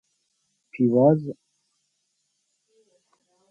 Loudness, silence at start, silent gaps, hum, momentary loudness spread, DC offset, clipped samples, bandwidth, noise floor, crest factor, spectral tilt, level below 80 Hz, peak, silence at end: -21 LUFS; 0.75 s; none; none; 26 LU; under 0.1%; under 0.1%; 4.9 kHz; -75 dBFS; 20 dB; -11.5 dB/octave; -74 dBFS; -6 dBFS; 2.2 s